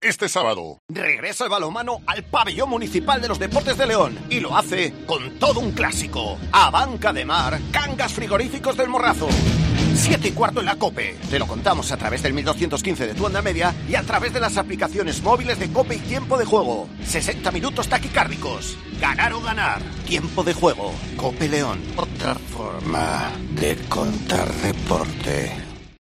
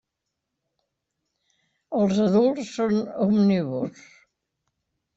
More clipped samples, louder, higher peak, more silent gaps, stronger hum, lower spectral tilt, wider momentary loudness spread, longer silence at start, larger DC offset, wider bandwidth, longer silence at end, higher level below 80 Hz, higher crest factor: neither; about the same, -21 LUFS vs -23 LUFS; first, -2 dBFS vs -10 dBFS; first, 0.79-0.89 s vs none; neither; second, -4.5 dB/octave vs -7.5 dB/octave; second, 7 LU vs 10 LU; second, 0 s vs 1.9 s; neither; first, 14 kHz vs 7.8 kHz; second, 0.1 s vs 1.25 s; first, -36 dBFS vs -64 dBFS; about the same, 20 dB vs 16 dB